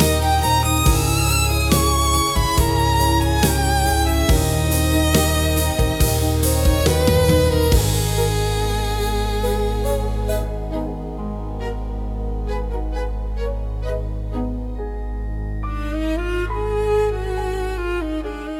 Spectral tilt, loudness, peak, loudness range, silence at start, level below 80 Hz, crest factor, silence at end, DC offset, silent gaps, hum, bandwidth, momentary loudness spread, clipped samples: -4.5 dB/octave; -20 LUFS; -4 dBFS; 9 LU; 0 s; -24 dBFS; 14 dB; 0 s; under 0.1%; none; none; 18 kHz; 11 LU; under 0.1%